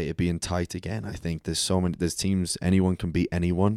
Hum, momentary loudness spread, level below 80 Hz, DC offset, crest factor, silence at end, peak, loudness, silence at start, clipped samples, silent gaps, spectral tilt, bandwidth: none; 9 LU; -44 dBFS; under 0.1%; 16 dB; 0 s; -10 dBFS; -27 LUFS; 0 s; under 0.1%; none; -5.5 dB/octave; 14 kHz